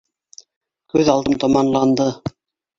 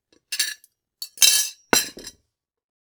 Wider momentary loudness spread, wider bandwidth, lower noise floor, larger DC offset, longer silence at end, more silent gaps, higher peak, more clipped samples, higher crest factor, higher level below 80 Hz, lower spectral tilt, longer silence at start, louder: second, 10 LU vs 23 LU; second, 7.6 kHz vs over 20 kHz; second, -47 dBFS vs -74 dBFS; neither; second, 0.5 s vs 0.8 s; neither; about the same, -2 dBFS vs 0 dBFS; neither; second, 18 dB vs 24 dB; first, -50 dBFS vs -60 dBFS; first, -6 dB/octave vs 1 dB/octave; first, 0.95 s vs 0.3 s; about the same, -17 LUFS vs -19 LUFS